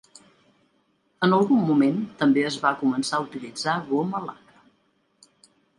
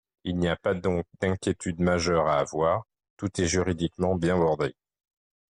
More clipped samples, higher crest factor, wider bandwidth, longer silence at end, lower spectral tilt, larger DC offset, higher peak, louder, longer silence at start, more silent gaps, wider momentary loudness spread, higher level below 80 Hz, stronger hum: neither; first, 20 dB vs 14 dB; about the same, 11.5 kHz vs 11 kHz; first, 1.45 s vs 0.8 s; about the same, -5.5 dB/octave vs -5.5 dB/octave; neither; first, -6 dBFS vs -12 dBFS; first, -23 LUFS vs -27 LUFS; first, 1.2 s vs 0.25 s; second, none vs 3.10-3.17 s; first, 10 LU vs 7 LU; second, -70 dBFS vs -54 dBFS; neither